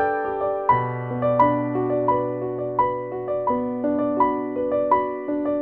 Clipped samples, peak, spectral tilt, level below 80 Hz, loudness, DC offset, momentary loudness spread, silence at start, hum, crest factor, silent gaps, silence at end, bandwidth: under 0.1%; -6 dBFS; -10.5 dB/octave; -54 dBFS; -23 LUFS; under 0.1%; 6 LU; 0 s; none; 16 dB; none; 0 s; 4.3 kHz